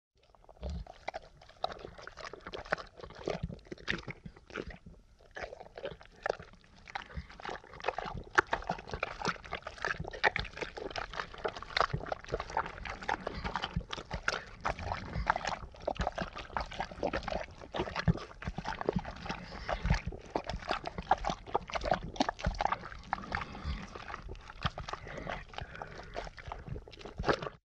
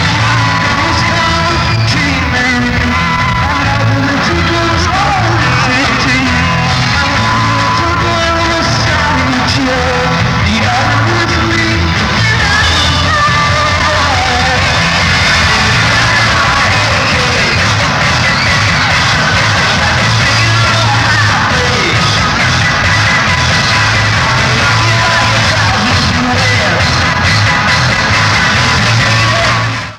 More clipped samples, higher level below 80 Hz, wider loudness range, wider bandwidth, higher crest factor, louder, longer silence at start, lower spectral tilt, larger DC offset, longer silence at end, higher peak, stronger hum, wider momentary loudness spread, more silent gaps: neither; second, -48 dBFS vs -26 dBFS; first, 8 LU vs 2 LU; second, 9.4 kHz vs 13.5 kHz; first, 28 dB vs 10 dB; second, -38 LUFS vs -9 LUFS; first, 0.4 s vs 0 s; about the same, -5 dB/octave vs -4 dB/octave; neither; about the same, 0.1 s vs 0 s; second, -10 dBFS vs 0 dBFS; neither; first, 12 LU vs 3 LU; neither